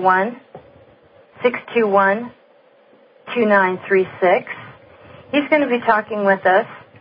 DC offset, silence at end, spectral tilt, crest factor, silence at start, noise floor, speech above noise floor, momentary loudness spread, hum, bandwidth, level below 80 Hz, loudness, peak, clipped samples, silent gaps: under 0.1%; 0.2 s; -10.5 dB/octave; 16 dB; 0 s; -52 dBFS; 35 dB; 12 LU; none; 5.2 kHz; -64 dBFS; -17 LUFS; -2 dBFS; under 0.1%; none